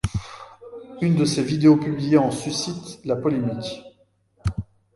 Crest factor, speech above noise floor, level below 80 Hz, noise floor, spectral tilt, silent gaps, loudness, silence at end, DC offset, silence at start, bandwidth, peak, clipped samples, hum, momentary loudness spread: 18 dB; 40 dB; -42 dBFS; -61 dBFS; -6 dB/octave; none; -22 LUFS; 0.35 s; under 0.1%; 0.05 s; 11.5 kHz; -4 dBFS; under 0.1%; none; 23 LU